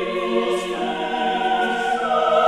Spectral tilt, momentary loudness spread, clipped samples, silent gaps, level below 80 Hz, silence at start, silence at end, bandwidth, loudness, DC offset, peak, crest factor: -4 dB/octave; 4 LU; under 0.1%; none; -56 dBFS; 0 s; 0 s; 13 kHz; -21 LUFS; 0.2%; -4 dBFS; 16 dB